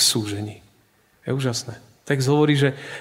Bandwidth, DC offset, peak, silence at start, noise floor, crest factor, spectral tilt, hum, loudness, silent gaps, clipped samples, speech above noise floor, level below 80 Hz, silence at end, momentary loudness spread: 16 kHz; under 0.1%; -4 dBFS; 0 s; -60 dBFS; 18 dB; -4 dB/octave; none; -22 LUFS; none; under 0.1%; 38 dB; -62 dBFS; 0 s; 18 LU